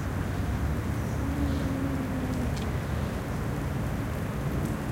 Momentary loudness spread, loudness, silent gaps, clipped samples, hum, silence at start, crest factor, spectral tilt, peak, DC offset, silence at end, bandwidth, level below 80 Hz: 3 LU; -31 LUFS; none; under 0.1%; none; 0 s; 14 dB; -7 dB/octave; -16 dBFS; under 0.1%; 0 s; 16.5 kHz; -36 dBFS